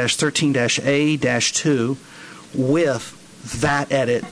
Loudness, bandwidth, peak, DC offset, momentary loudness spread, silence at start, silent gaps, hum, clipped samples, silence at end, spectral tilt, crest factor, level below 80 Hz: -19 LUFS; 11 kHz; -8 dBFS; under 0.1%; 14 LU; 0 s; none; none; under 0.1%; 0 s; -4 dB/octave; 14 dB; -50 dBFS